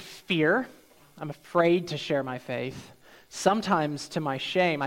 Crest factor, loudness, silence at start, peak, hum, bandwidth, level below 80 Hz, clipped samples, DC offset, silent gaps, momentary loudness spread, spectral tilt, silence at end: 20 dB; -27 LUFS; 0 s; -8 dBFS; none; 16.5 kHz; -66 dBFS; under 0.1%; under 0.1%; none; 16 LU; -5 dB/octave; 0 s